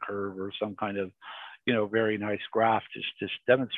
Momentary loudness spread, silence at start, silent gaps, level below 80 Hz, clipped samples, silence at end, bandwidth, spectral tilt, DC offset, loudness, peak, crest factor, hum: 10 LU; 0 s; none; -66 dBFS; under 0.1%; 0 s; 4.3 kHz; -8 dB/octave; under 0.1%; -30 LUFS; -8 dBFS; 22 dB; none